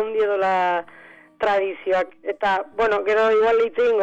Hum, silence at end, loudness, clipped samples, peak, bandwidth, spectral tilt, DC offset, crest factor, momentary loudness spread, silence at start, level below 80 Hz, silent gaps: none; 0 s; -21 LUFS; under 0.1%; -14 dBFS; 8 kHz; -4.5 dB/octave; under 0.1%; 8 dB; 7 LU; 0 s; -56 dBFS; none